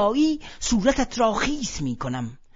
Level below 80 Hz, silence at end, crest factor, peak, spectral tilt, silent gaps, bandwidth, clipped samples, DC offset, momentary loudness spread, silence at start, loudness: -38 dBFS; 0.2 s; 18 dB; -6 dBFS; -4.5 dB/octave; none; 7.8 kHz; under 0.1%; under 0.1%; 8 LU; 0 s; -24 LUFS